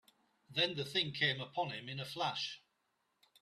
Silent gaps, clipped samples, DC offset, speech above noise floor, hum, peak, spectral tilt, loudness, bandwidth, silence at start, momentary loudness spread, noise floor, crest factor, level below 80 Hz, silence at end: none; under 0.1%; under 0.1%; 44 dB; none; -20 dBFS; -4 dB/octave; -37 LUFS; 14 kHz; 0.5 s; 9 LU; -82 dBFS; 20 dB; -78 dBFS; 0.85 s